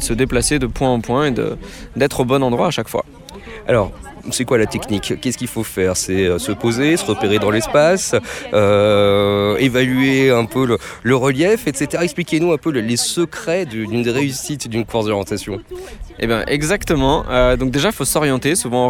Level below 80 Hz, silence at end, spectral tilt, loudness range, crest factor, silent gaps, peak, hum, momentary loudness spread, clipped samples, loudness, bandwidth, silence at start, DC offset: -34 dBFS; 0 s; -4.5 dB/octave; 5 LU; 16 dB; none; -2 dBFS; none; 10 LU; under 0.1%; -17 LUFS; 18 kHz; 0 s; under 0.1%